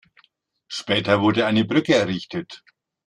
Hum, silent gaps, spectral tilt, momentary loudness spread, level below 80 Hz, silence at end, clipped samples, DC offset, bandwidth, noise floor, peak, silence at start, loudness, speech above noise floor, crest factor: none; none; -5.5 dB/octave; 14 LU; -60 dBFS; 0.5 s; under 0.1%; under 0.1%; 10.5 kHz; -65 dBFS; -4 dBFS; 0.7 s; -20 LUFS; 44 dB; 18 dB